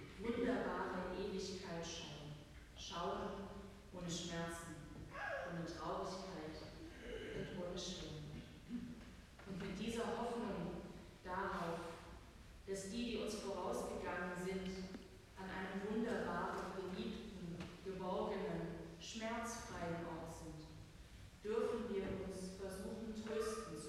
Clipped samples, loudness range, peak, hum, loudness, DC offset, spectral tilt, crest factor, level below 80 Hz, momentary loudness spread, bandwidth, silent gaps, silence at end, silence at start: under 0.1%; 3 LU; -28 dBFS; none; -46 LUFS; under 0.1%; -5 dB/octave; 18 dB; -62 dBFS; 13 LU; 15.5 kHz; none; 0 s; 0 s